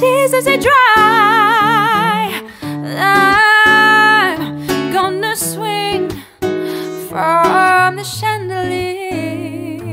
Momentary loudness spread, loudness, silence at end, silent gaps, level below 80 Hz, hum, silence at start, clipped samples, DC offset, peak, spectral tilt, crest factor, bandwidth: 15 LU; -12 LUFS; 0 s; none; -46 dBFS; none; 0 s; under 0.1%; under 0.1%; 0 dBFS; -3.5 dB/octave; 12 dB; 16.5 kHz